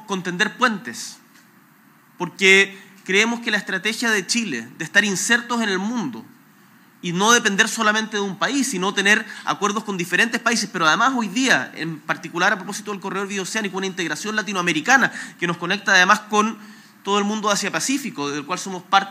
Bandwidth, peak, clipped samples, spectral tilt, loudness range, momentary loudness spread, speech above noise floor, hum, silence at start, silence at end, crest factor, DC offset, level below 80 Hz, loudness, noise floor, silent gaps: 16 kHz; 0 dBFS; under 0.1%; -2.5 dB/octave; 3 LU; 12 LU; 32 dB; none; 0 s; 0 s; 22 dB; under 0.1%; -84 dBFS; -19 LUFS; -53 dBFS; none